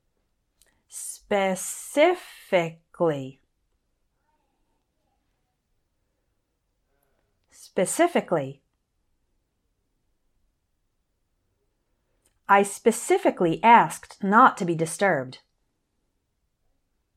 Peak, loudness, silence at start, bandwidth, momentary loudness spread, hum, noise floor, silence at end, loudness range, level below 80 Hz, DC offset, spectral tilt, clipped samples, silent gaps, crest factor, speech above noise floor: -2 dBFS; -22 LUFS; 0.95 s; 15.5 kHz; 18 LU; none; -75 dBFS; 1.8 s; 13 LU; -68 dBFS; under 0.1%; -4.5 dB/octave; under 0.1%; none; 24 dB; 53 dB